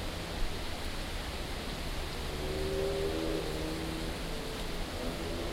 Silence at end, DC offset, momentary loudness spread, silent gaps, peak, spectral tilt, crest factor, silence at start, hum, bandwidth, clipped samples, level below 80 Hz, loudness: 0 s; under 0.1%; 5 LU; none; -20 dBFS; -4.5 dB/octave; 16 dB; 0 s; none; 16 kHz; under 0.1%; -40 dBFS; -37 LUFS